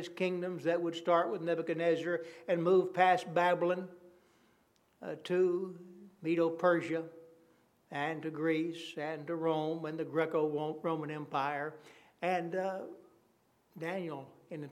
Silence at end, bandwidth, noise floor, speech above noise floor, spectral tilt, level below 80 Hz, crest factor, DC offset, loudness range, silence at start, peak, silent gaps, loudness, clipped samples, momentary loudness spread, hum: 0 s; 13 kHz; -71 dBFS; 38 dB; -6.5 dB/octave; -88 dBFS; 22 dB; under 0.1%; 7 LU; 0 s; -14 dBFS; none; -34 LUFS; under 0.1%; 15 LU; none